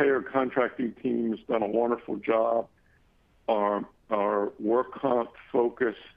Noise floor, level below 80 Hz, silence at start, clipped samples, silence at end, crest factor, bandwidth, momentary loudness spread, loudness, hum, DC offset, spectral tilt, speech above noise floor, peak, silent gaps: -63 dBFS; -66 dBFS; 0 s; under 0.1%; 0.1 s; 18 dB; 5 kHz; 5 LU; -28 LUFS; none; under 0.1%; -9 dB/octave; 36 dB; -10 dBFS; none